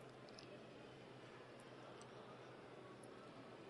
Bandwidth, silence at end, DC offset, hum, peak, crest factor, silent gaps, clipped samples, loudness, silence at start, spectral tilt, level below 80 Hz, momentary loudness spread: 11 kHz; 0 s; under 0.1%; none; -40 dBFS; 18 dB; none; under 0.1%; -58 LUFS; 0 s; -5 dB/octave; -84 dBFS; 1 LU